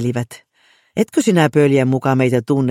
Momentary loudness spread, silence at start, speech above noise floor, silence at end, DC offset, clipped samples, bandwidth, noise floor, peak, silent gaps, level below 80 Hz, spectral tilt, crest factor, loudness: 12 LU; 0 s; 41 dB; 0 s; under 0.1%; under 0.1%; 16 kHz; -56 dBFS; -2 dBFS; none; -58 dBFS; -6.5 dB/octave; 14 dB; -16 LUFS